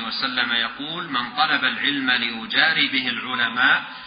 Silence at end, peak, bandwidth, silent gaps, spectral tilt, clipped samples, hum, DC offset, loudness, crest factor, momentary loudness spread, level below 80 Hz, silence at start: 0 s; -2 dBFS; 5.2 kHz; none; -7 dB/octave; under 0.1%; none; under 0.1%; -20 LUFS; 20 dB; 8 LU; -64 dBFS; 0 s